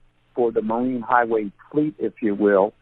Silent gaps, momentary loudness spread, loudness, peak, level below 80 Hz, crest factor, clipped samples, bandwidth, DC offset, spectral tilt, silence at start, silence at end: none; 7 LU; -22 LUFS; -2 dBFS; -60 dBFS; 20 dB; under 0.1%; 4 kHz; under 0.1%; -10.5 dB/octave; 0.35 s; 0.1 s